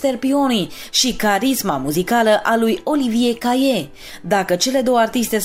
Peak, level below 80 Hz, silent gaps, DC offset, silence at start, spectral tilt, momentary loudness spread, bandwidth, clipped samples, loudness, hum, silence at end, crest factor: -4 dBFS; -46 dBFS; none; under 0.1%; 0 s; -3.5 dB/octave; 5 LU; 16 kHz; under 0.1%; -17 LUFS; none; 0 s; 14 dB